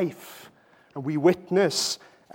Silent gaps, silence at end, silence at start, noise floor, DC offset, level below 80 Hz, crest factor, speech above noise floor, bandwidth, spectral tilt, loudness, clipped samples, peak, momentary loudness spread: none; 0.4 s; 0 s; -56 dBFS; under 0.1%; -72 dBFS; 20 dB; 31 dB; 17 kHz; -4.5 dB/octave; -25 LUFS; under 0.1%; -6 dBFS; 20 LU